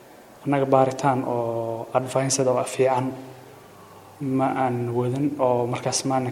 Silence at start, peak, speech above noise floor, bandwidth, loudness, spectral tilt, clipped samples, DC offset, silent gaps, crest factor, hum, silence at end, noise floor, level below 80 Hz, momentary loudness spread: 0.1 s; -4 dBFS; 23 dB; 16.5 kHz; -23 LUFS; -5 dB/octave; under 0.1%; under 0.1%; none; 20 dB; none; 0 s; -46 dBFS; -66 dBFS; 8 LU